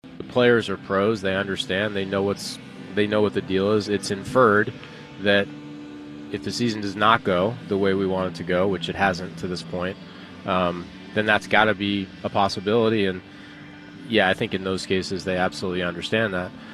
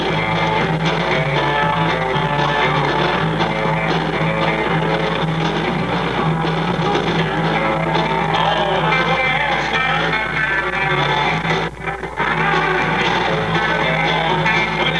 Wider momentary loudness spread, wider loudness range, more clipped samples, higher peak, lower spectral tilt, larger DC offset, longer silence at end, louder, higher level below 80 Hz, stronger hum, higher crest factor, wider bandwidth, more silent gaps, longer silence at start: first, 16 LU vs 3 LU; about the same, 2 LU vs 2 LU; neither; about the same, -2 dBFS vs -4 dBFS; about the same, -5 dB/octave vs -5.5 dB/octave; second, under 0.1% vs 0.4%; about the same, 0 s vs 0 s; second, -23 LUFS vs -17 LUFS; second, -56 dBFS vs -38 dBFS; neither; first, 22 dB vs 14 dB; first, 13.5 kHz vs 11 kHz; neither; about the same, 0.05 s vs 0 s